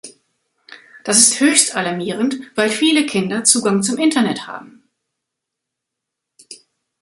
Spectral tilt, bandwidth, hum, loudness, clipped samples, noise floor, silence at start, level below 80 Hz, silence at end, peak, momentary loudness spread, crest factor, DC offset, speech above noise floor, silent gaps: -2.5 dB/octave; 16 kHz; none; -15 LUFS; under 0.1%; -81 dBFS; 0.05 s; -64 dBFS; 0.45 s; 0 dBFS; 12 LU; 20 dB; under 0.1%; 64 dB; none